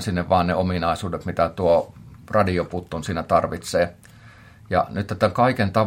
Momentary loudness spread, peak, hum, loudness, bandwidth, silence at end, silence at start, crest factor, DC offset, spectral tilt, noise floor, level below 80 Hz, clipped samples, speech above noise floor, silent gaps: 8 LU; -4 dBFS; none; -22 LUFS; 16.5 kHz; 0 s; 0 s; 18 dB; under 0.1%; -6.5 dB/octave; -46 dBFS; -50 dBFS; under 0.1%; 25 dB; none